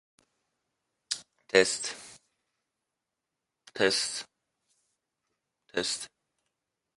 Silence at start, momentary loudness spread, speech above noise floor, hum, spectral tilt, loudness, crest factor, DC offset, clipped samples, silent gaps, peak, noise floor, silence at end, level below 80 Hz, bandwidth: 1.1 s; 21 LU; 59 dB; none; -1.5 dB/octave; -29 LUFS; 30 dB; under 0.1%; under 0.1%; none; -4 dBFS; -87 dBFS; 0.9 s; -72 dBFS; 11.5 kHz